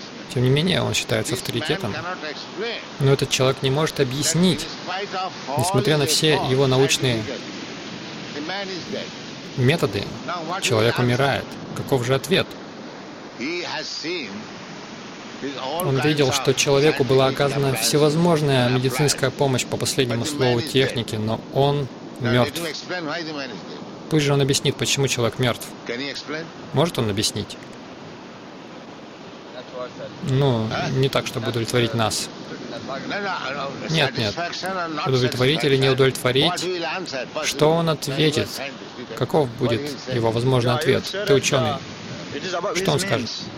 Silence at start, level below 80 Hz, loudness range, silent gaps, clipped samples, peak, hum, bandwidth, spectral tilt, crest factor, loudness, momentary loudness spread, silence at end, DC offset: 0 s; -52 dBFS; 7 LU; none; under 0.1%; -4 dBFS; none; 16.5 kHz; -4.5 dB/octave; 18 dB; -21 LUFS; 15 LU; 0 s; under 0.1%